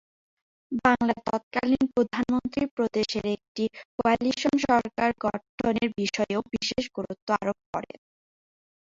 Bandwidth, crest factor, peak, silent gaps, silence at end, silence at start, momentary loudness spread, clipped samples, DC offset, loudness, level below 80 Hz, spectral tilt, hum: 7.8 kHz; 20 dB; -8 dBFS; 1.43-1.51 s, 2.71-2.77 s, 3.48-3.55 s, 3.85-3.98 s, 5.49-5.58 s, 7.22-7.27 s, 7.66-7.73 s; 0.95 s; 0.7 s; 8 LU; under 0.1%; under 0.1%; -27 LUFS; -56 dBFS; -5 dB/octave; none